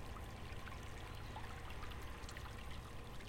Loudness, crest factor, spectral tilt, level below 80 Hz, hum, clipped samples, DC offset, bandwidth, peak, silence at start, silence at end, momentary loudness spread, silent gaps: -51 LUFS; 16 dB; -4.5 dB/octave; -54 dBFS; none; under 0.1%; under 0.1%; 16.5 kHz; -32 dBFS; 0 s; 0 s; 1 LU; none